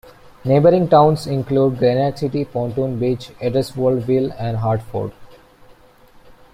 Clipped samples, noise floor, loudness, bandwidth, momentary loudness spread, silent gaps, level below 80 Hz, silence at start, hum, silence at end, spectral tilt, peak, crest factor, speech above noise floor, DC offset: under 0.1%; -48 dBFS; -18 LUFS; 15 kHz; 10 LU; none; -48 dBFS; 0.05 s; none; 1.2 s; -8 dB/octave; -2 dBFS; 16 dB; 31 dB; under 0.1%